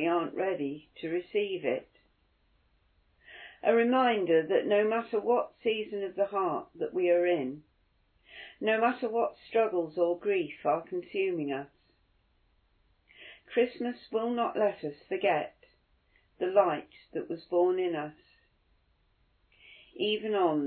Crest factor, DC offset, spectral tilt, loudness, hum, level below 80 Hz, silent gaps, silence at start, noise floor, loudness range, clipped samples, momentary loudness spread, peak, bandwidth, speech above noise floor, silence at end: 20 dB; under 0.1%; -3 dB/octave; -30 LUFS; none; -74 dBFS; none; 0 s; -70 dBFS; 7 LU; under 0.1%; 13 LU; -12 dBFS; 4.5 kHz; 41 dB; 0 s